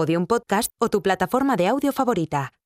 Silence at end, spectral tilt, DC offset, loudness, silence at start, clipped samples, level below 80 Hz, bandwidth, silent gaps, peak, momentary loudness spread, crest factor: 0.15 s; -5.5 dB/octave; under 0.1%; -22 LUFS; 0 s; under 0.1%; -54 dBFS; 15.5 kHz; none; -6 dBFS; 3 LU; 14 dB